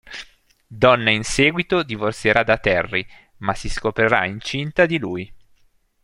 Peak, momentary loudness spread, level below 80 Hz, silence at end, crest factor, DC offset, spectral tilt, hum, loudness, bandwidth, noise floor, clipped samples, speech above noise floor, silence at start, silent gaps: 0 dBFS; 13 LU; -40 dBFS; 0.65 s; 20 dB; under 0.1%; -4.5 dB/octave; none; -19 LUFS; 12 kHz; -58 dBFS; under 0.1%; 39 dB; 0.1 s; none